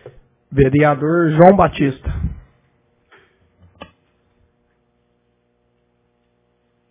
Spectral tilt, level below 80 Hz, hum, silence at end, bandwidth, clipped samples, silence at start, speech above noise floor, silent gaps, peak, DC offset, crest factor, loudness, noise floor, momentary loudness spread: -12 dB/octave; -36 dBFS; 60 Hz at -55 dBFS; 4.55 s; 4 kHz; under 0.1%; 0.05 s; 51 dB; none; 0 dBFS; under 0.1%; 18 dB; -14 LUFS; -64 dBFS; 15 LU